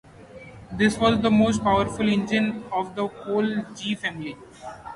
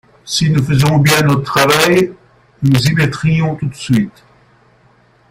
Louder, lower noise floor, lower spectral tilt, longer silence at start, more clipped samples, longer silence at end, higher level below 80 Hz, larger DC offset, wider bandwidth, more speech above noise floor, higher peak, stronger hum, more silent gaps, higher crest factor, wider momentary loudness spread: second, -23 LUFS vs -13 LUFS; second, -44 dBFS vs -50 dBFS; about the same, -5.5 dB/octave vs -5 dB/octave; about the same, 0.2 s vs 0.25 s; neither; second, 0 s vs 1.2 s; second, -50 dBFS vs -42 dBFS; neither; second, 11.5 kHz vs 16.5 kHz; second, 21 dB vs 38 dB; second, -6 dBFS vs 0 dBFS; neither; neither; about the same, 18 dB vs 14 dB; first, 20 LU vs 9 LU